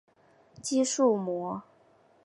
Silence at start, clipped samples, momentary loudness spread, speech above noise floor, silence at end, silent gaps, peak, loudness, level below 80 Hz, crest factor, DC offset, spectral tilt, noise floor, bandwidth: 0.6 s; under 0.1%; 14 LU; 35 dB; 0.65 s; none; -12 dBFS; -28 LUFS; -76 dBFS; 18 dB; under 0.1%; -4.5 dB/octave; -62 dBFS; 11.5 kHz